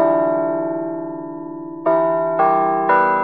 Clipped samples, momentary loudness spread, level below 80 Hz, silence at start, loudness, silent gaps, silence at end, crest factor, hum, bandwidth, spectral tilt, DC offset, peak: under 0.1%; 14 LU; -70 dBFS; 0 s; -18 LUFS; none; 0 s; 14 dB; none; 4.6 kHz; -6 dB/octave; 0.3%; -4 dBFS